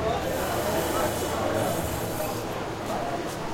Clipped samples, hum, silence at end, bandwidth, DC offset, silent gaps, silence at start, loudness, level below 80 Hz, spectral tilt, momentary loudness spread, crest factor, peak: under 0.1%; none; 0 s; 16.5 kHz; under 0.1%; none; 0 s; -28 LUFS; -46 dBFS; -4.5 dB/octave; 5 LU; 14 dB; -14 dBFS